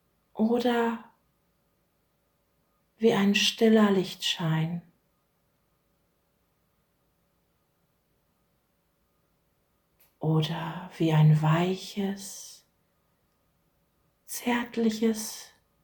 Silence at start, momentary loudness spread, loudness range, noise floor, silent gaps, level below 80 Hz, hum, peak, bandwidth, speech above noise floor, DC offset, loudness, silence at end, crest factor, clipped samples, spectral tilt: 0.35 s; 17 LU; 9 LU; -72 dBFS; none; -70 dBFS; none; -10 dBFS; over 20 kHz; 47 dB; under 0.1%; -26 LUFS; 0.4 s; 20 dB; under 0.1%; -5.5 dB/octave